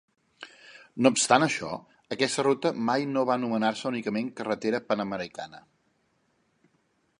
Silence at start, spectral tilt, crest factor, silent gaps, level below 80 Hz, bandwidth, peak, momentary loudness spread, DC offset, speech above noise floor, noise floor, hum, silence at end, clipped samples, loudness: 0.4 s; -4 dB/octave; 24 dB; none; -72 dBFS; 11.5 kHz; -4 dBFS; 20 LU; under 0.1%; 44 dB; -71 dBFS; none; 1.6 s; under 0.1%; -27 LUFS